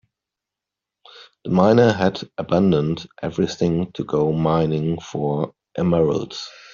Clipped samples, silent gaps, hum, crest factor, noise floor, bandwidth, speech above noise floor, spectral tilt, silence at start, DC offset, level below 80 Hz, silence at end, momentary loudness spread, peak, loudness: under 0.1%; none; none; 18 dB; -86 dBFS; 7.4 kHz; 66 dB; -6.5 dB/octave; 1.15 s; under 0.1%; -52 dBFS; 0.25 s; 12 LU; -2 dBFS; -20 LUFS